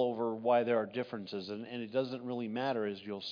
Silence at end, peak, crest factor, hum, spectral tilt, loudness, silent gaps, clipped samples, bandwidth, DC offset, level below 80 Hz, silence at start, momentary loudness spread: 0 s; -18 dBFS; 18 dB; none; -4 dB/octave; -35 LUFS; none; under 0.1%; 5.2 kHz; under 0.1%; -84 dBFS; 0 s; 11 LU